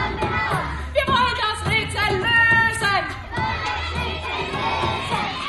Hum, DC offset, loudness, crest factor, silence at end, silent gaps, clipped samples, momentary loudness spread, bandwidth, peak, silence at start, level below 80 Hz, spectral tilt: none; under 0.1%; -20 LUFS; 16 dB; 0 s; none; under 0.1%; 10 LU; 12 kHz; -6 dBFS; 0 s; -36 dBFS; -4 dB/octave